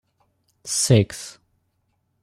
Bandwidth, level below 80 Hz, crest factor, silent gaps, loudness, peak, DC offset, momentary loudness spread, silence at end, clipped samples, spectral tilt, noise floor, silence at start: 14.5 kHz; -56 dBFS; 22 dB; none; -20 LUFS; -4 dBFS; under 0.1%; 21 LU; 0.95 s; under 0.1%; -4.5 dB/octave; -71 dBFS; 0.65 s